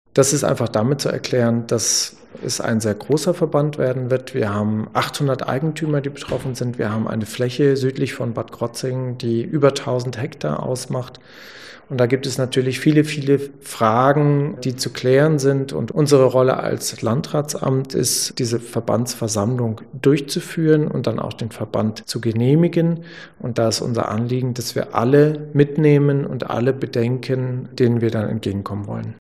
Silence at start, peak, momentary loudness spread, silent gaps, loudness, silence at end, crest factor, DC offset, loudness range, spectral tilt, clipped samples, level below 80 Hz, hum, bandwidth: 0.15 s; -2 dBFS; 10 LU; none; -20 LUFS; 0.1 s; 18 dB; 0.2%; 4 LU; -5.5 dB/octave; under 0.1%; -56 dBFS; none; 14.5 kHz